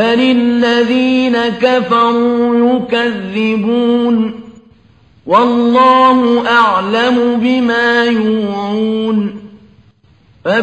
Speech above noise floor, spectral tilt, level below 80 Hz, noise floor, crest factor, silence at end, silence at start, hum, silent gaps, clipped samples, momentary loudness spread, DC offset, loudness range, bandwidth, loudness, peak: 37 dB; -6 dB/octave; -54 dBFS; -48 dBFS; 12 dB; 0 s; 0 s; none; none; under 0.1%; 7 LU; 0.1%; 4 LU; 8.4 kHz; -12 LUFS; 0 dBFS